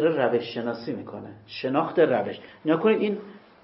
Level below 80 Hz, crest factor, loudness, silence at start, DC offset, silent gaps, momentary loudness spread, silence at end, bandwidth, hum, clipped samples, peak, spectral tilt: -72 dBFS; 18 dB; -25 LUFS; 0 s; under 0.1%; none; 13 LU; 0.25 s; 5.8 kHz; none; under 0.1%; -8 dBFS; -10.5 dB/octave